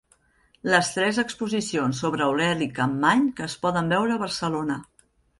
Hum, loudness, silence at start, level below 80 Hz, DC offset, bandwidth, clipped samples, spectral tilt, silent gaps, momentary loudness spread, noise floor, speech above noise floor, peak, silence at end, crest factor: none; -24 LUFS; 0.65 s; -58 dBFS; under 0.1%; 11.5 kHz; under 0.1%; -4.5 dB/octave; none; 7 LU; -63 dBFS; 39 dB; -6 dBFS; 0.55 s; 20 dB